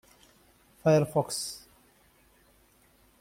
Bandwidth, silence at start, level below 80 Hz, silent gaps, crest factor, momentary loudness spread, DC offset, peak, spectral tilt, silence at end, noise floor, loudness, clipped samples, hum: 16.5 kHz; 0.85 s; -66 dBFS; none; 20 dB; 14 LU; under 0.1%; -12 dBFS; -5.5 dB/octave; 1.65 s; -63 dBFS; -28 LUFS; under 0.1%; none